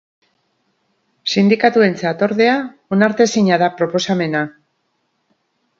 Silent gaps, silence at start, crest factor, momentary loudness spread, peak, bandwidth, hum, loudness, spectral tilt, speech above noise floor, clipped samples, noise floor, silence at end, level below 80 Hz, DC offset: none; 1.25 s; 18 dB; 8 LU; 0 dBFS; 7.6 kHz; none; -16 LUFS; -5.5 dB/octave; 53 dB; under 0.1%; -68 dBFS; 1.3 s; -64 dBFS; under 0.1%